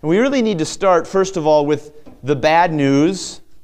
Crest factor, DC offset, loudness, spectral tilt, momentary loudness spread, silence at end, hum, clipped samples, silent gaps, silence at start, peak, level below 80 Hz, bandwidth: 14 dB; under 0.1%; -16 LUFS; -5.5 dB/octave; 9 LU; 0 s; none; under 0.1%; none; 0.05 s; -2 dBFS; -48 dBFS; 11 kHz